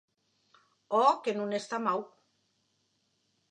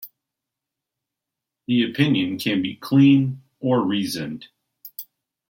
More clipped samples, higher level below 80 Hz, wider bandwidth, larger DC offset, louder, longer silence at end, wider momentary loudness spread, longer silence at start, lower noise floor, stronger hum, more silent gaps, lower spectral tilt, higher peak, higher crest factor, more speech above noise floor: neither; second, under -90 dBFS vs -66 dBFS; second, 9.8 kHz vs 16.5 kHz; neither; second, -30 LUFS vs -21 LUFS; first, 1.45 s vs 0.45 s; second, 9 LU vs 21 LU; first, 0.9 s vs 0 s; second, -76 dBFS vs -85 dBFS; neither; neither; second, -4.5 dB/octave vs -6.5 dB/octave; second, -12 dBFS vs -4 dBFS; about the same, 22 dB vs 18 dB; second, 47 dB vs 65 dB